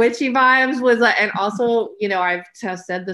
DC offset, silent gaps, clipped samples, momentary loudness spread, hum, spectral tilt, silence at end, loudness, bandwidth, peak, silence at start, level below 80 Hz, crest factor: under 0.1%; none; under 0.1%; 12 LU; none; -4.5 dB/octave; 0 s; -17 LUFS; 11.5 kHz; -4 dBFS; 0 s; -66 dBFS; 14 dB